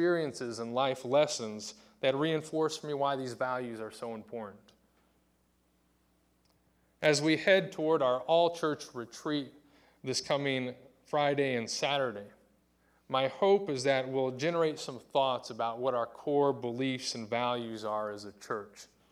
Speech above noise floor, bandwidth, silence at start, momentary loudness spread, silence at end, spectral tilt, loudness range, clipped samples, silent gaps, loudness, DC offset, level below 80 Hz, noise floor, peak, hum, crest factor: 40 dB; 14.5 kHz; 0 s; 13 LU; 0.25 s; -4.5 dB/octave; 7 LU; under 0.1%; none; -32 LUFS; under 0.1%; -76 dBFS; -72 dBFS; -12 dBFS; none; 20 dB